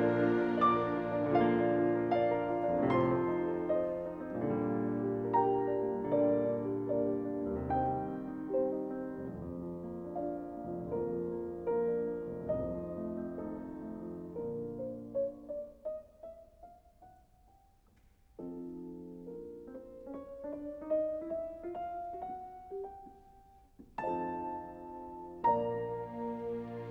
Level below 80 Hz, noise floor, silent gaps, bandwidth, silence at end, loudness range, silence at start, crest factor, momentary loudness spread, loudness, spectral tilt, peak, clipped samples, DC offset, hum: -60 dBFS; -65 dBFS; none; 5.6 kHz; 0 s; 15 LU; 0 s; 18 dB; 17 LU; -35 LUFS; -9.5 dB/octave; -18 dBFS; under 0.1%; under 0.1%; none